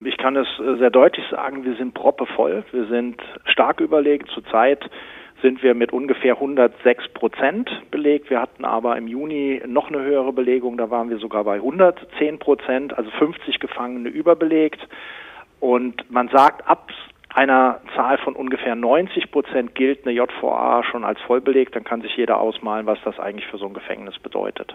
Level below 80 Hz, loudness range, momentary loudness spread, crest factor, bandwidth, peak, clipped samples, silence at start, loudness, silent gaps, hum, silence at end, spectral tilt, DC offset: -62 dBFS; 3 LU; 11 LU; 18 dB; 6.6 kHz; -2 dBFS; under 0.1%; 0 s; -20 LUFS; none; none; 0 s; -6.5 dB/octave; under 0.1%